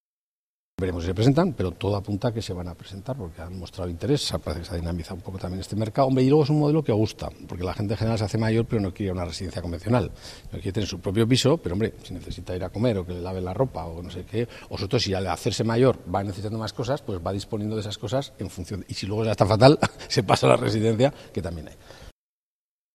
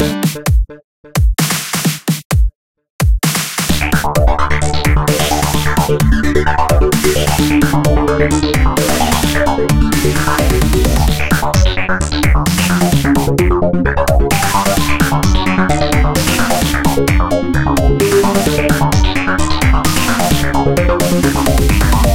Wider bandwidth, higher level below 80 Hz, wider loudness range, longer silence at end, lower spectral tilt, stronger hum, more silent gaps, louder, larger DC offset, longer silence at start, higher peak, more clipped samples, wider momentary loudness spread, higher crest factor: second, 14 kHz vs 17 kHz; second, -46 dBFS vs -18 dBFS; first, 7 LU vs 2 LU; first, 0.85 s vs 0 s; first, -6.5 dB/octave vs -5 dB/octave; neither; second, none vs 0.84-1.04 s, 2.25-2.30 s, 2.55-2.75 s, 2.90-2.99 s; second, -25 LUFS vs -13 LUFS; second, under 0.1% vs 6%; first, 0.8 s vs 0 s; about the same, 0 dBFS vs 0 dBFS; neither; first, 15 LU vs 3 LU; first, 24 dB vs 12 dB